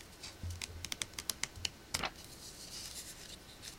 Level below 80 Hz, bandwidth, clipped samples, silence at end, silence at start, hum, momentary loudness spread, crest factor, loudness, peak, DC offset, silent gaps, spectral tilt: -58 dBFS; 17 kHz; under 0.1%; 0 s; 0 s; none; 11 LU; 32 dB; -42 LUFS; -14 dBFS; under 0.1%; none; -1.5 dB/octave